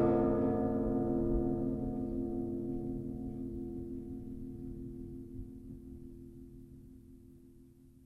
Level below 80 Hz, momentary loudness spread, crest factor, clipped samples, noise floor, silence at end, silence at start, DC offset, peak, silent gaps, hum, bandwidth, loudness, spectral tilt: -48 dBFS; 21 LU; 18 dB; under 0.1%; -59 dBFS; 0 s; 0 s; under 0.1%; -18 dBFS; none; none; 3.5 kHz; -37 LUFS; -11 dB/octave